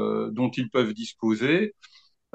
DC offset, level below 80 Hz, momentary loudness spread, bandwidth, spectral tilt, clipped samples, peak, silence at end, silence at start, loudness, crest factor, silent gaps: under 0.1%; -74 dBFS; 6 LU; 8.6 kHz; -6 dB/octave; under 0.1%; -8 dBFS; 0.65 s; 0 s; -26 LUFS; 20 dB; none